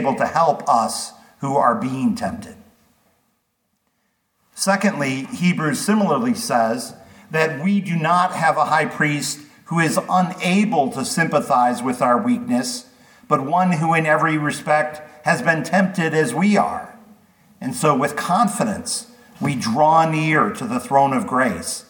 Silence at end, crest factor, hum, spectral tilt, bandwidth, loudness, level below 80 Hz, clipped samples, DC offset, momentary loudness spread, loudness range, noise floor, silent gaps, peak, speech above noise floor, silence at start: 0.1 s; 18 dB; none; -5 dB/octave; 19 kHz; -19 LUFS; -62 dBFS; under 0.1%; under 0.1%; 9 LU; 5 LU; -70 dBFS; none; -2 dBFS; 51 dB; 0 s